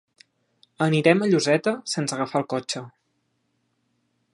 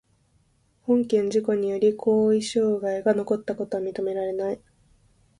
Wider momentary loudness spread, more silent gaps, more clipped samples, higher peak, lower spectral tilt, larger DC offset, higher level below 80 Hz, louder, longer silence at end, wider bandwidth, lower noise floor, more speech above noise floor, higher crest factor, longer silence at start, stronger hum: about the same, 10 LU vs 8 LU; neither; neither; first, -4 dBFS vs -8 dBFS; about the same, -5 dB/octave vs -6 dB/octave; neither; second, -72 dBFS vs -64 dBFS; about the same, -23 LUFS vs -24 LUFS; first, 1.45 s vs 0.85 s; about the same, 11.5 kHz vs 11 kHz; first, -72 dBFS vs -64 dBFS; first, 50 dB vs 41 dB; first, 22 dB vs 16 dB; about the same, 0.8 s vs 0.85 s; neither